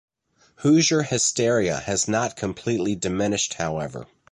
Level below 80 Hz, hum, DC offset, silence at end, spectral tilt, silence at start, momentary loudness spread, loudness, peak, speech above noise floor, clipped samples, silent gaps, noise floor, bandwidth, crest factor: -52 dBFS; none; under 0.1%; 0.3 s; -4 dB/octave; 0.6 s; 10 LU; -22 LUFS; -8 dBFS; 39 dB; under 0.1%; none; -61 dBFS; 11.5 kHz; 16 dB